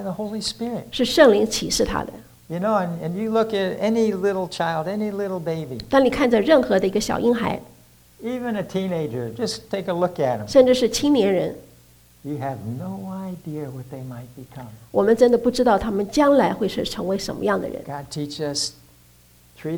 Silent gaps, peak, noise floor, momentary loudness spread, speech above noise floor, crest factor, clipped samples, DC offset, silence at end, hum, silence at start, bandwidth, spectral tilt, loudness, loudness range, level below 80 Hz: none; -2 dBFS; -53 dBFS; 16 LU; 32 dB; 20 dB; under 0.1%; under 0.1%; 0 s; 60 Hz at -50 dBFS; 0 s; over 20 kHz; -5 dB/octave; -21 LUFS; 6 LU; -48 dBFS